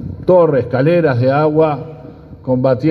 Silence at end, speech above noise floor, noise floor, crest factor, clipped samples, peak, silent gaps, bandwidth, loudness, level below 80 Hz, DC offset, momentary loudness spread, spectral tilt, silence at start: 0 s; 22 dB; -35 dBFS; 14 dB; under 0.1%; 0 dBFS; none; 5.6 kHz; -13 LUFS; -46 dBFS; under 0.1%; 12 LU; -10 dB/octave; 0 s